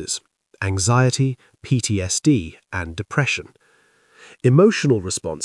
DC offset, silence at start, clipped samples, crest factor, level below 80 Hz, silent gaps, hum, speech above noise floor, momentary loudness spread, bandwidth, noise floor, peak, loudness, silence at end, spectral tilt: under 0.1%; 0 s; under 0.1%; 18 dB; -54 dBFS; none; none; 39 dB; 13 LU; 12 kHz; -58 dBFS; -2 dBFS; -20 LUFS; 0 s; -5 dB/octave